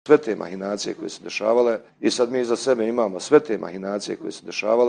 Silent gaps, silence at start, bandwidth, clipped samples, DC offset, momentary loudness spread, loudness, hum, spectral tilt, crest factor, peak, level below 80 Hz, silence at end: none; 0.05 s; 10 kHz; under 0.1%; under 0.1%; 11 LU; -23 LUFS; none; -4.5 dB/octave; 20 dB; -2 dBFS; -70 dBFS; 0 s